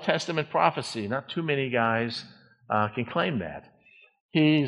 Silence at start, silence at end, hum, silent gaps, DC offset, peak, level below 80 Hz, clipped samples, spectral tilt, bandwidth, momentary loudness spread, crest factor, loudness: 0 s; 0 s; none; 4.20-4.29 s; under 0.1%; -6 dBFS; -66 dBFS; under 0.1%; -6 dB/octave; 11 kHz; 9 LU; 22 dB; -27 LUFS